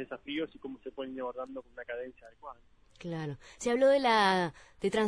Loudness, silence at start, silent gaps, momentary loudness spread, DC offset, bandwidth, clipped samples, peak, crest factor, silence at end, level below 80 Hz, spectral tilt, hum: -31 LUFS; 0 s; none; 21 LU; under 0.1%; 10.5 kHz; under 0.1%; -14 dBFS; 18 dB; 0 s; -64 dBFS; -4.5 dB/octave; none